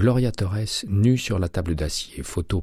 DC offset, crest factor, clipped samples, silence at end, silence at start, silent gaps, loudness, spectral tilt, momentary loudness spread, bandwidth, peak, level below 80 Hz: under 0.1%; 14 dB; under 0.1%; 0 s; 0 s; none; -24 LUFS; -6 dB/octave; 9 LU; 14.5 kHz; -8 dBFS; -36 dBFS